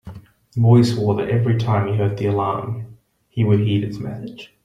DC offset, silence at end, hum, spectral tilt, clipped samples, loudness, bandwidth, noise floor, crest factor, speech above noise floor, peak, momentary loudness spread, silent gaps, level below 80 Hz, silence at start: under 0.1%; 0.2 s; none; -8.5 dB/octave; under 0.1%; -19 LUFS; 10 kHz; -39 dBFS; 16 dB; 21 dB; -2 dBFS; 17 LU; none; -52 dBFS; 0.05 s